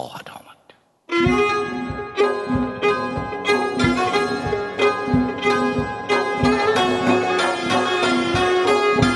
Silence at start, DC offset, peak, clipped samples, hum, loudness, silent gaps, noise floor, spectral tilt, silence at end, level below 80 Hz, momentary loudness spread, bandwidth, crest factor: 0 s; under 0.1%; -4 dBFS; under 0.1%; none; -20 LUFS; none; -54 dBFS; -5 dB/octave; 0 s; -42 dBFS; 7 LU; 12 kHz; 16 dB